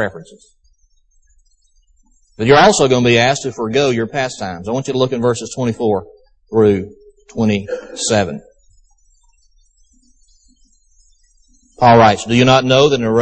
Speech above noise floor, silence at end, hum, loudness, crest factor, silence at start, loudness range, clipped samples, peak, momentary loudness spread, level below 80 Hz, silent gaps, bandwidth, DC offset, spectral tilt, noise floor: 41 dB; 0 s; none; -14 LUFS; 16 dB; 0 s; 8 LU; under 0.1%; 0 dBFS; 12 LU; -46 dBFS; none; 8.8 kHz; under 0.1%; -5 dB/octave; -55 dBFS